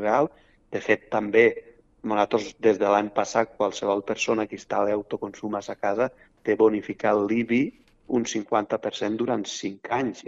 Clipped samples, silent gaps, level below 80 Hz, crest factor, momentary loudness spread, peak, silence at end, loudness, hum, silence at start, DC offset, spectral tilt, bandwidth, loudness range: under 0.1%; none; -62 dBFS; 20 dB; 10 LU; -4 dBFS; 0 s; -25 LUFS; none; 0 s; under 0.1%; -4.5 dB/octave; 8 kHz; 3 LU